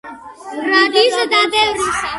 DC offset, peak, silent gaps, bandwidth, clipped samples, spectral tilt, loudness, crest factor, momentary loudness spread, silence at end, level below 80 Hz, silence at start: under 0.1%; 0 dBFS; none; 11.5 kHz; under 0.1%; -1.5 dB/octave; -14 LUFS; 16 dB; 19 LU; 0 s; -50 dBFS; 0.05 s